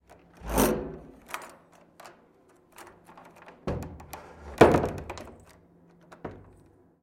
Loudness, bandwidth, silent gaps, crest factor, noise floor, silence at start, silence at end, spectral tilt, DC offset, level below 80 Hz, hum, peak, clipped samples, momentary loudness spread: -27 LUFS; 16.5 kHz; none; 26 dB; -60 dBFS; 0.4 s; 0.65 s; -5.5 dB/octave; under 0.1%; -46 dBFS; none; -6 dBFS; under 0.1%; 30 LU